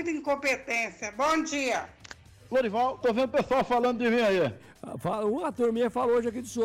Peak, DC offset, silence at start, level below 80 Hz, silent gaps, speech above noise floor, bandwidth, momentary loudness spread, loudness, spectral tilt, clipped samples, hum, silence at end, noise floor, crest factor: -18 dBFS; under 0.1%; 0 s; -60 dBFS; none; 22 dB; 15.5 kHz; 8 LU; -27 LUFS; -4.5 dB/octave; under 0.1%; none; 0 s; -49 dBFS; 8 dB